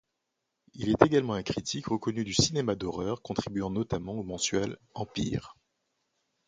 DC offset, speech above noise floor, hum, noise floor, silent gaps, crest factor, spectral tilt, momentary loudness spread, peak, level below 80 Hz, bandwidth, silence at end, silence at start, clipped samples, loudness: under 0.1%; 53 dB; none; -83 dBFS; none; 26 dB; -4.5 dB/octave; 12 LU; -4 dBFS; -54 dBFS; 9.6 kHz; 0.95 s; 0.75 s; under 0.1%; -30 LUFS